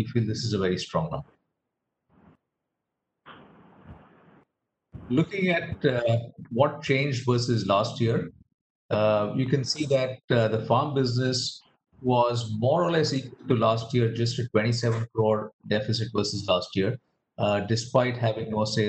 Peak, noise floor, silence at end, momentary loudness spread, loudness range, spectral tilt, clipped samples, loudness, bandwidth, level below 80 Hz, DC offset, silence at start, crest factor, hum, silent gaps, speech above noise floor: -6 dBFS; -83 dBFS; 0 s; 6 LU; 7 LU; -6 dB/octave; under 0.1%; -26 LUFS; 8.8 kHz; -60 dBFS; under 0.1%; 0 s; 20 dB; none; 8.54-8.89 s, 10.24-10.28 s, 15.53-15.59 s; 58 dB